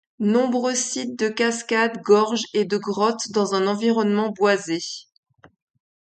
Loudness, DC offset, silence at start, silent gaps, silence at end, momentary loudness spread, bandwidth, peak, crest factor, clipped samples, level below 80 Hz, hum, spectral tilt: -21 LUFS; under 0.1%; 0.2 s; none; 1.15 s; 7 LU; 9.2 kHz; -4 dBFS; 18 dB; under 0.1%; -70 dBFS; none; -4 dB/octave